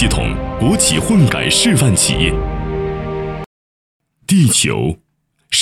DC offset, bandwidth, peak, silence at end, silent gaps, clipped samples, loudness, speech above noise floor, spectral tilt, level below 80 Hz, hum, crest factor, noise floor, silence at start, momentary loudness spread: under 0.1%; 16 kHz; 0 dBFS; 0 s; 3.46-4.00 s; under 0.1%; -14 LUFS; 27 dB; -4 dB/octave; -28 dBFS; none; 16 dB; -40 dBFS; 0 s; 12 LU